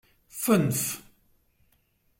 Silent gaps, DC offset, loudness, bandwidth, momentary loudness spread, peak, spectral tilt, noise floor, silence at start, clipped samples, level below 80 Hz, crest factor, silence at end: none; under 0.1%; -26 LUFS; 16.5 kHz; 16 LU; -8 dBFS; -5 dB/octave; -68 dBFS; 0.35 s; under 0.1%; -62 dBFS; 22 dB; 1.2 s